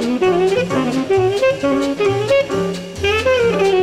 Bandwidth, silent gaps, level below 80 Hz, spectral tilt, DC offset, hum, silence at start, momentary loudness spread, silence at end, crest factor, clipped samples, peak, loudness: 13 kHz; none; -42 dBFS; -5.5 dB/octave; under 0.1%; none; 0 s; 5 LU; 0 s; 12 dB; under 0.1%; -4 dBFS; -16 LUFS